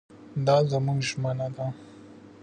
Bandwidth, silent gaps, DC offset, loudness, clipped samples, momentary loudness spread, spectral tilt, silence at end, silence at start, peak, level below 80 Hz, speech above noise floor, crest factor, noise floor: 9.6 kHz; none; under 0.1%; -27 LUFS; under 0.1%; 13 LU; -6 dB/octave; 0 s; 0.1 s; -10 dBFS; -66 dBFS; 23 dB; 18 dB; -48 dBFS